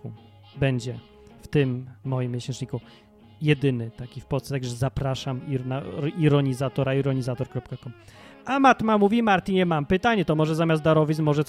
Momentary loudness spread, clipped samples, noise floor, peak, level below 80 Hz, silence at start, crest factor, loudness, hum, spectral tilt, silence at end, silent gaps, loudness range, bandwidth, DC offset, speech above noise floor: 14 LU; under 0.1%; -45 dBFS; -4 dBFS; -50 dBFS; 0.05 s; 20 dB; -24 LUFS; none; -7 dB/octave; 0.05 s; none; 7 LU; 13 kHz; under 0.1%; 21 dB